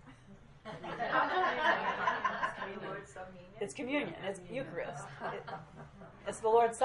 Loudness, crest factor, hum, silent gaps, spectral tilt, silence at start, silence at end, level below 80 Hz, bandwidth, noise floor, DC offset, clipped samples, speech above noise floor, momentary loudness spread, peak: -35 LUFS; 20 dB; none; none; -4 dB/octave; 0.05 s; 0 s; -66 dBFS; 11.5 kHz; -56 dBFS; under 0.1%; under 0.1%; 21 dB; 19 LU; -16 dBFS